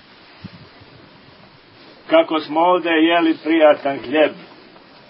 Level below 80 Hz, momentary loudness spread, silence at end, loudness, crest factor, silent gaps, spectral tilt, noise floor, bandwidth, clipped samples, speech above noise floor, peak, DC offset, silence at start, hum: -64 dBFS; 6 LU; 0.65 s; -16 LUFS; 18 dB; none; -9.5 dB/octave; -46 dBFS; 5.6 kHz; under 0.1%; 31 dB; 0 dBFS; under 0.1%; 0.45 s; none